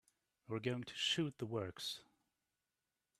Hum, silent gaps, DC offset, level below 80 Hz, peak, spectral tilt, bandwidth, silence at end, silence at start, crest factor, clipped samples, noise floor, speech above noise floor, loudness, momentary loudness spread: none; none; under 0.1%; -78 dBFS; -24 dBFS; -4 dB/octave; 13.5 kHz; 1.15 s; 0.5 s; 22 dB; under 0.1%; under -90 dBFS; over 48 dB; -42 LUFS; 9 LU